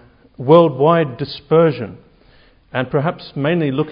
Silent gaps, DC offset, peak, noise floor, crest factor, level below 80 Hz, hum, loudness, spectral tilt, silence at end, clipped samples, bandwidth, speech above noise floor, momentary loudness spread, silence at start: none; under 0.1%; 0 dBFS; -50 dBFS; 16 dB; -54 dBFS; none; -16 LUFS; -10.5 dB/octave; 0 s; under 0.1%; 5.4 kHz; 34 dB; 15 LU; 0.4 s